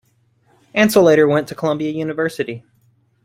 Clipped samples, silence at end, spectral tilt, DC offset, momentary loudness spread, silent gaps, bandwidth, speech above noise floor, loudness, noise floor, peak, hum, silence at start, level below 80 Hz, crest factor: under 0.1%; 0.65 s; -5.5 dB/octave; under 0.1%; 14 LU; none; 16.5 kHz; 43 dB; -17 LUFS; -59 dBFS; -2 dBFS; none; 0.75 s; -60 dBFS; 16 dB